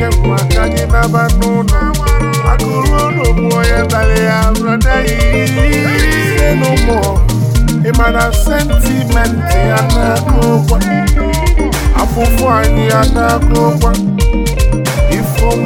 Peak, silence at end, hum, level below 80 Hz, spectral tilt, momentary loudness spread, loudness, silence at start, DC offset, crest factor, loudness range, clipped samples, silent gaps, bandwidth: 0 dBFS; 0 s; none; -14 dBFS; -5.5 dB/octave; 2 LU; -12 LUFS; 0 s; under 0.1%; 10 dB; 1 LU; under 0.1%; none; 17.5 kHz